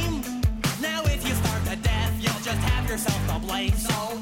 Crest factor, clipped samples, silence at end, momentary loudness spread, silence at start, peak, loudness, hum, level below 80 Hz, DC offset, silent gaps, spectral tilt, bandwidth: 14 dB; under 0.1%; 0 s; 2 LU; 0 s; -10 dBFS; -26 LUFS; none; -32 dBFS; under 0.1%; none; -4.5 dB/octave; 17 kHz